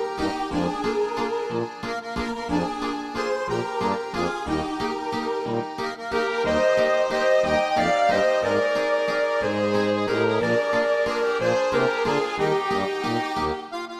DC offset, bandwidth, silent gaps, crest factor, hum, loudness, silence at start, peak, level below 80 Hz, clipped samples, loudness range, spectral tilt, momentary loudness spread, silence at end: under 0.1%; 14 kHz; none; 14 dB; none; -24 LUFS; 0 s; -10 dBFS; -50 dBFS; under 0.1%; 5 LU; -5 dB/octave; 8 LU; 0 s